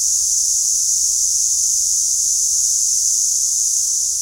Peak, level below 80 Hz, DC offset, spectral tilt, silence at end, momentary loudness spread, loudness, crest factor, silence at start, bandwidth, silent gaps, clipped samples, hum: -4 dBFS; -50 dBFS; under 0.1%; 3.5 dB/octave; 0 s; 1 LU; -14 LUFS; 14 dB; 0 s; 16 kHz; none; under 0.1%; none